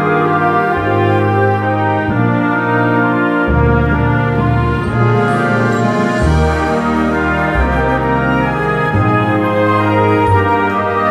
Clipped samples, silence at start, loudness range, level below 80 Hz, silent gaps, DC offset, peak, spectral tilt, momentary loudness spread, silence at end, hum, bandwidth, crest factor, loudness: under 0.1%; 0 s; 1 LU; -26 dBFS; none; under 0.1%; 0 dBFS; -8 dB/octave; 2 LU; 0 s; none; 12 kHz; 12 dB; -13 LUFS